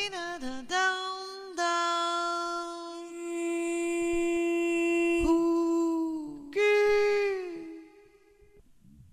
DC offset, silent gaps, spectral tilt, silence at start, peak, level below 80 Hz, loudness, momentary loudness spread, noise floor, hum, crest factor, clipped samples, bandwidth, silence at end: under 0.1%; none; -3 dB/octave; 0 s; -14 dBFS; -52 dBFS; -29 LUFS; 13 LU; -59 dBFS; none; 14 dB; under 0.1%; 12.5 kHz; 1.25 s